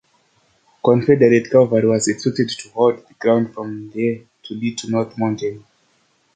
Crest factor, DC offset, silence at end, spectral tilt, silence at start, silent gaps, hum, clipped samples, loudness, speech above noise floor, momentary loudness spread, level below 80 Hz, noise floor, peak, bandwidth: 18 dB; under 0.1%; 0.75 s; -6 dB/octave; 0.85 s; none; none; under 0.1%; -18 LUFS; 44 dB; 13 LU; -60 dBFS; -61 dBFS; -2 dBFS; 9.6 kHz